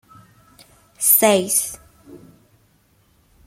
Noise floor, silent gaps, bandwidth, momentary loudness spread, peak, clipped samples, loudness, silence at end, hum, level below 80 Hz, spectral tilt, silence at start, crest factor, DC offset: -59 dBFS; none; 16.5 kHz; 16 LU; -2 dBFS; under 0.1%; -16 LUFS; 1.3 s; none; -60 dBFS; -2.5 dB/octave; 1 s; 22 dB; under 0.1%